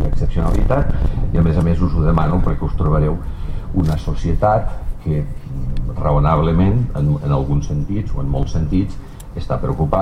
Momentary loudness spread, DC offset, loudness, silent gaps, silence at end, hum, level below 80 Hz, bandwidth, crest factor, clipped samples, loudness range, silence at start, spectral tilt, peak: 11 LU; under 0.1%; -19 LUFS; none; 0 s; none; -20 dBFS; 8.6 kHz; 14 dB; under 0.1%; 2 LU; 0 s; -9 dB/octave; -2 dBFS